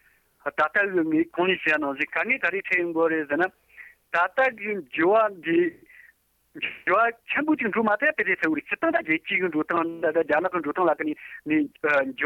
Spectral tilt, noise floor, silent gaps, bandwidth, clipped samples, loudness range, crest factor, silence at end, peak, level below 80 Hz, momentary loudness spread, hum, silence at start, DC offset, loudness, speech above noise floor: -6.5 dB/octave; -61 dBFS; none; 7.2 kHz; under 0.1%; 1 LU; 14 dB; 0 s; -12 dBFS; -68 dBFS; 7 LU; none; 0.45 s; under 0.1%; -24 LUFS; 36 dB